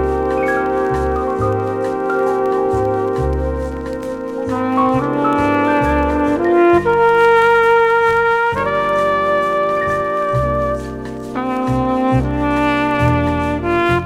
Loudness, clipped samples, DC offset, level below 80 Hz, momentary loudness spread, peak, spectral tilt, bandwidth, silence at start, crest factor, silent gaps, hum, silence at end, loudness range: -16 LUFS; under 0.1%; under 0.1%; -32 dBFS; 9 LU; -2 dBFS; -7.5 dB/octave; 15.5 kHz; 0 s; 14 dB; none; none; 0 s; 5 LU